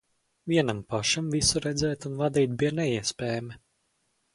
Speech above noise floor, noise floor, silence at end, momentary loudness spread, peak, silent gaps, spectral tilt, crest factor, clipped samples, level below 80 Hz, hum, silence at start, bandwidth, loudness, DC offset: 46 dB; -73 dBFS; 0.8 s; 8 LU; -10 dBFS; none; -4 dB/octave; 20 dB; under 0.1%; -52 dBFS; none; 0.45 s; 11.5 kHz; -27 LUFS; under 0.1%